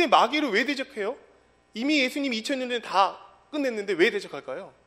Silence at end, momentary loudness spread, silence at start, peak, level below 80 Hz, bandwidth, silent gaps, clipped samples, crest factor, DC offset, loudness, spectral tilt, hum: 0.2 s; 13 LU; 0 s; -4 dBFS; -72 dBFS; 15.5 kHz; none; under 0.1%; 22 dB; under 0.1%; -26 LUFS; -3 dB/octave; none